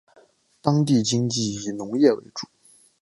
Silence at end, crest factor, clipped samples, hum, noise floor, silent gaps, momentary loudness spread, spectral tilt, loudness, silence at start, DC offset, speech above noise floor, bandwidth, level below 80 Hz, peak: 0.6 s; 20 dB; under 0.1%; none; -58 dBFS; none; 15 LU; -5.5 dB/octave; -22 LUFS; 0.65 s; under 0.1%; 36 dB; 11.5 kHz; -62 dBFS; -4 dBFS